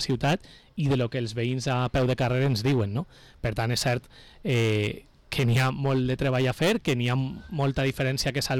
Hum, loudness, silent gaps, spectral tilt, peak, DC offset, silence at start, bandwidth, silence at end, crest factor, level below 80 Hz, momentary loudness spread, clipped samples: none; -26 LUFS; none; -5.5 dB/octave; -18 dBFS; under 0.1%; 0 s; 16 kHz; 0 s; 8 dB; -46 dBFS; 8 LU; under 0.1%